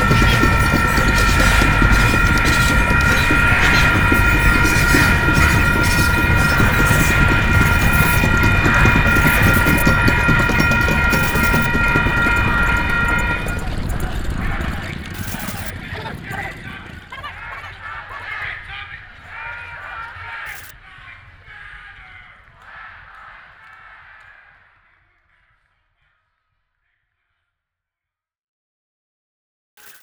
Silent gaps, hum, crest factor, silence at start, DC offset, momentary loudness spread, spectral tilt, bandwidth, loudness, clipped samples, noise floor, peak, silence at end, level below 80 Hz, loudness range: none; none; 18 dB; 0 s; under 0.1%; 18 LU; -4.5 dB/octave; over 20 kHz; -15 LUFS; under 0.1%; -87 dBFS; 0 dBFS; 6.65 s; -24 dBFS; 17 LU